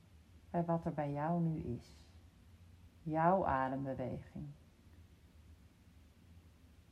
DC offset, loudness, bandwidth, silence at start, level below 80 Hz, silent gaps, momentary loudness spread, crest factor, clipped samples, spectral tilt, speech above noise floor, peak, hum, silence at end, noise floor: under 0.1%; -38 LUFS; 8.6 kHz; 0.15 s; -62 dBFS; none; 18 LU; 22 dB; under 0.1%; -9 dB/octave; 26 dB; -20 dBFS; none; 0.4 s; -63 dBFS